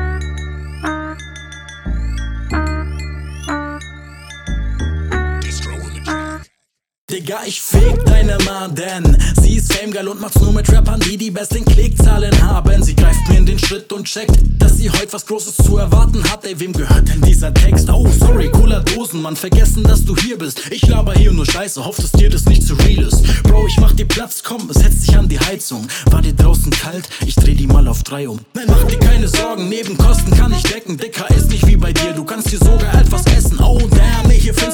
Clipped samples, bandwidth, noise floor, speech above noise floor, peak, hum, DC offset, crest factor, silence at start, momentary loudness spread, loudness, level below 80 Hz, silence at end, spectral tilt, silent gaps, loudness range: under 0.1%; 18.5 kHz; -70 dBFS; 60 dB; 0 dBFS; none; under 0.1%; 10 dB; 0 s; 12 LU; -14 LUFS; -12 dBFS; 0 s; -5 dB/octave; 6.98-7.08 s; 10 LU